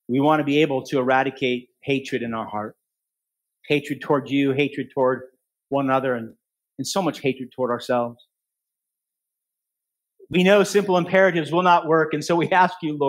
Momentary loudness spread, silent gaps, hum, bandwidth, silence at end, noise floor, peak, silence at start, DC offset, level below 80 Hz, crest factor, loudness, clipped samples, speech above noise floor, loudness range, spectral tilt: 11 LU; none; none; 16 kHz; 0 s; -85 dBFS; -2 dBFS; 0.1 s; under 0.1%; -68 dBFS; 20 dB; -21 LUFS; under 0.1%; 64 dB; 8 LU; -5.5 dB/octave